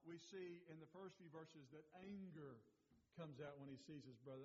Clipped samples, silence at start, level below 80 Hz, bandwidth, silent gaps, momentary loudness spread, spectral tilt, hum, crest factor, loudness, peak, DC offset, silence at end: under 0.1%; 0 s; under -90 dBFS; 7.4 kHz; none; 7 LU; -6 dB/octave; none; 16 dB; -59 LUFS; -44 dBFS; under 0.1%; 0 s